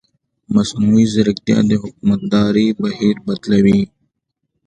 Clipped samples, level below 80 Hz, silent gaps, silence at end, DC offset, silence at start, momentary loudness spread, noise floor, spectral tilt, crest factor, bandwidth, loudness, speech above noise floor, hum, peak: under 0.1%; -46 dBFS; none; 0.8 s; under 0.1%; 0.5 s; 5 LU; -73 dBFS; -6.5 dB/octave; 16 dB; 9.2 kHz; -15 LUFS; 59 dB; none; 0 dBFS